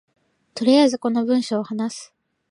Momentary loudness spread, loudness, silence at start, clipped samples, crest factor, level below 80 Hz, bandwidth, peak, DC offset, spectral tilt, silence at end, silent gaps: 15 LU; -20 LUFS; 0.55 s; under 0.1%; 16 dB; -74 dBFS; 11 kHz; -4 dBFS; under 0.1%; -4.5 dB/octave; 0.45 s; none